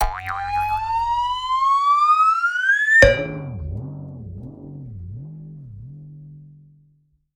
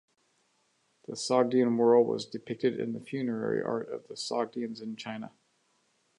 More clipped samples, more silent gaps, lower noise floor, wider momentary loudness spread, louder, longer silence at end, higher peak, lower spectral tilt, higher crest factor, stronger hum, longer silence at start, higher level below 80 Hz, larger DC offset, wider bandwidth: neither; neither; second, -61 dBFS vs -72 dBFS; first, 25 LU vs 16 LU; first, -17 LUFS vs -30 LUFS; about the same, 0.85 s vs 0.9 s; first, 0 dBFS vs -10 dBFS; about the same, -4.5 dB/octave vs -5.5 dB/octave; about the same, 22 dB vs 20 dB; neither; second, 0 s vs 1.1 s; first, -36 dBFS vs -82 dBFS; neither; first, 17 kHz vs 11 kHz